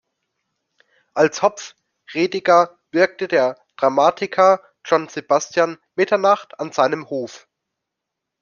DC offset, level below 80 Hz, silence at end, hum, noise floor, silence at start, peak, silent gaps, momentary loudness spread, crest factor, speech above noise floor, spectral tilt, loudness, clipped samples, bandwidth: under 0.1%; -68 dBFS; 1.05 s; none; -82 dBFS; 1.15 s; -2 dBFS; none; 12 LU; 18 dB; 64 dB; -4 dB/octave; -19 LUFS; under 0.1%; 7.2 kHz